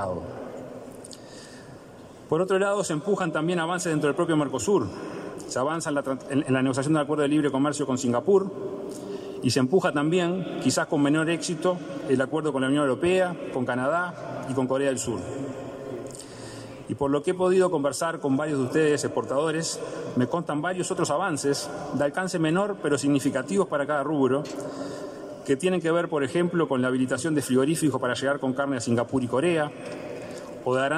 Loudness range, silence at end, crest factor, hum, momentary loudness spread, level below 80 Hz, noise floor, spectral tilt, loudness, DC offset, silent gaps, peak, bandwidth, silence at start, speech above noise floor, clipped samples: 3 LU; 0 s; 16 dB; none; 14 LU; -64 dBFS; -45 dBFS; -5.5 dB/octave; -26 LUFS; under 0.1%; none; -10 dBFS; 15.5 kHz; 0 s; 21 dB; under 0.1%